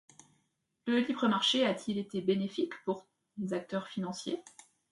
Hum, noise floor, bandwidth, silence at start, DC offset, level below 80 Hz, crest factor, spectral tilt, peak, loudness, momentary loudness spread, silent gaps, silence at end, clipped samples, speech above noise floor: none; -78 dBFS; 11.5 kHz; 0.85 s; under 0.1%; -78 dBFS; 18 dB; -4.5 dB/octave; -16 dBFS; -33 LUFS; 13 LU; none; 0.4 s; under 0.1%; 46 dB